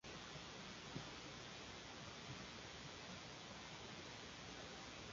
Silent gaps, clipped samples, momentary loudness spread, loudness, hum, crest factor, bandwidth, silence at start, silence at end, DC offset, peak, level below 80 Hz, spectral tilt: none; under 0.1%; 2 LU; -53 LUFS; none; 20 dB; 7.4 kHz; 0.05 s; 0 s; under 0.1%; -34 dBFS; -70 dBFS; -2.5 dB/octave